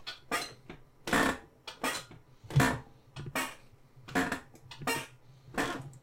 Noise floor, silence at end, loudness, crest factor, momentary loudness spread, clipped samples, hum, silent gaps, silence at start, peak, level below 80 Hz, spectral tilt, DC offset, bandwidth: -56 dBFS; 0.05 s; -34 LUFS; 22 dB; 22 LU; under 0.1%; none; none; 0 s; -14 dBFS; -56 dBFS; -4.5 dB/octave; under 0.1%; 16.5 kHz